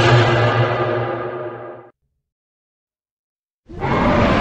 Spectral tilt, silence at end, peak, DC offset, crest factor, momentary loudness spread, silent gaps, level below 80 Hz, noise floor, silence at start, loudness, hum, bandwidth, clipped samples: -6.5 dB/octave; 0 s; -2 dBFS; under 0.1%; 18 dB; 16 LU; 2.32-2.87 s, 3.11-3.43 s, 3.50-3.63 s; -36 dBFS; -51 dBFS; 0 s; -18 LUFS; none; 8.4 kHz; under 0.1%